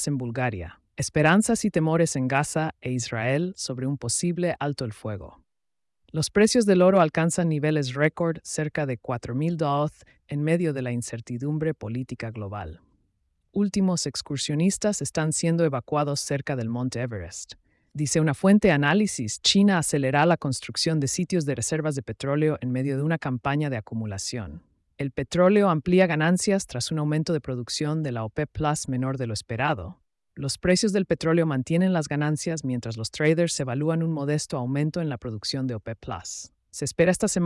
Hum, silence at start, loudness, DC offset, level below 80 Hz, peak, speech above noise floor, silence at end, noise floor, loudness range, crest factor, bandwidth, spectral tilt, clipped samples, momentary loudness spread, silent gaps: none; 0 s; -25 LUFS; under 0.1%; -54 dBFS; -8 dBFS; 64 dB; 0 s; -89 dBFS; 6 LU; 16 dB; 12 kHz; -5 dB/octave; under 0.1%; 12 LU; none